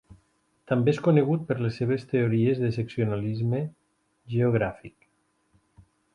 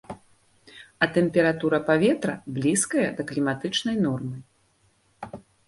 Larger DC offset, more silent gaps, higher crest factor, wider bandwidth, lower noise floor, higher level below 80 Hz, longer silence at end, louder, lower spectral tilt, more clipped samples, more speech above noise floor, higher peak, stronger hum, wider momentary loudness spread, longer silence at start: neither; neither; about the same, 18 dB vs 20 dB; second, 7.4 kHz vs 12 kHz; first, -70 dBFS vs -65 dBFS; about the same, -58 dBFS vs -62 dBFS; first, 1.25 s vs 0.3 s; about the same, -26 LUFS vs -24 LUFS; first, -9 dB/octave vs -4.5 dB/octave; neither; first, 45 dB vs 41 dB; about the same, -8 dBFS vs -6 dBFS; neither; second, 9 LU vs 20 LU; about the same, 0.1 s vs 0.1 s